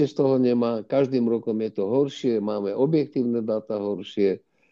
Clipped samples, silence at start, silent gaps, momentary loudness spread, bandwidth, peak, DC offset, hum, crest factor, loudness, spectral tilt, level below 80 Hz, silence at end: under 0.1%; 0 s; none; 6 LU; 7.4 kHz; -10 dBFS; under 0.1%; none; 14 dB; -24 LUFS; -8 dB/octave; -72 dBFS; 0.35 s